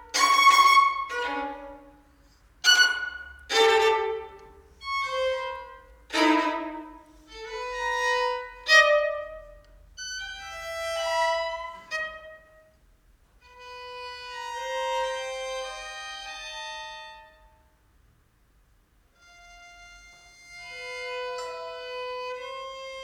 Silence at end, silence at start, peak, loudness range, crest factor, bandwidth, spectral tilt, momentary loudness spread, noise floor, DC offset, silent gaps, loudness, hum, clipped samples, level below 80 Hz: 0 s; 0 s; -6 dBFS; 16 LU; 22 dB; 19.5 kHz; -0.5 dB/octave; 23 LU; -63 dBFS; under 0.1%; none; -25 LUFS; none; under 0.1%; -58 dBFS